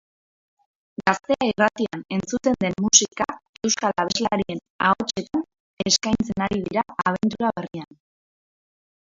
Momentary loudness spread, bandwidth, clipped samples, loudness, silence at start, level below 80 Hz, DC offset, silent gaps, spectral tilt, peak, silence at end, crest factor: 11 LU; 7.8 kHz; under 0.1%; -22 LUFS; 1 s; -54 dBFS; under 0.1%; 3.49-3.54 s, 4.70-4.79 s, 5.60-5.77 s; -3 dB/octave; 0 dBFS; 1.25 s; 24 dB